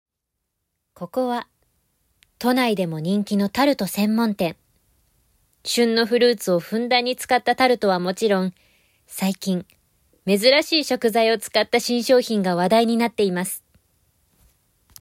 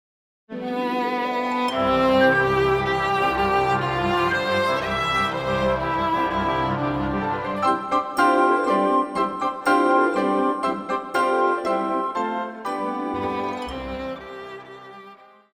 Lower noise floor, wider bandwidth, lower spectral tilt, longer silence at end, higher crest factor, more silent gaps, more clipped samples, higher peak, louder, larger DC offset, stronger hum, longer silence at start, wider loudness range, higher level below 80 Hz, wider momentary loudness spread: first, -80 dBFS vs -47 dBFS; about the same, 16 kHz vs 16 kHz; about the same, -4.5 dB/octave vs -5.5 dB/octave; first, 1.4 s vs 0.4 s; about the same, 18 dB vs 16 dB; neither; neither; about the same, -4 dBFS vs -6 dBFS; about the same, -20 LUFS vs -22 LUFS; neither; neither; first, 1 s vs 0.5 s; about the same, 4 LU vs 5 LU; second, -62 dBFS vs -46 dBFS; second, 9 LU vs 12 LU